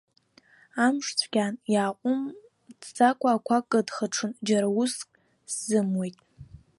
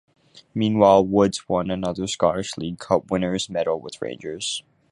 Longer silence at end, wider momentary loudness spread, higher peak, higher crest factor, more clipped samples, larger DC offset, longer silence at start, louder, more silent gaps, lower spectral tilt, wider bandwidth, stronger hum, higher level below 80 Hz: about the same, 0.2 s vs 0.3 s; about the same, 13 LU vs 15 LU; second, -8 dBFS vs -2 dBFS; about the same, 20 dB vs 20 dB; neither; neither; first, 0.75 s vs 0.35 s; second, -26 LUFS vs -22 LUFS; neither; about the same, -4 dB/octave vs -5 dB/octave; about the same, 11.5 kHz vs 11.5 kHz; neither; second, -68 dBFS vs -52 dBFS